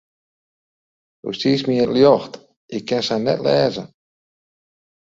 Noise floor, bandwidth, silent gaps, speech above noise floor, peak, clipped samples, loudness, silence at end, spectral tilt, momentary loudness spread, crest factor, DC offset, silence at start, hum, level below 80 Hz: under -90 dBFS; 7.8 kHz; 2.56-2.69 s; over 72 dB; 0 dBFS; under 0.1%; -18 LUFS; 1.15 s; -6 dB/octave; 17 LU; 20 dB; under 0.1%; 1.25 s; none; -58 dBFS